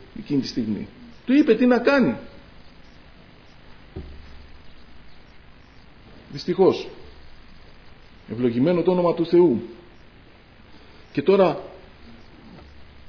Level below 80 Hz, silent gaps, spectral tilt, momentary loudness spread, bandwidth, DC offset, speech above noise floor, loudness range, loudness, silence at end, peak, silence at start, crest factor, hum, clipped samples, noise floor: -50 dBFS; none; -7.5 dB/octave; 22 LU; 5.4 kHz; under 0.1%; 29 dB; 6 LU; -21 LUFS; 0.25 s; -4 dBFS; 0.15 s; 20 dB; 50 Hz at -55 dBFS; under 0.1%; -49 dBFS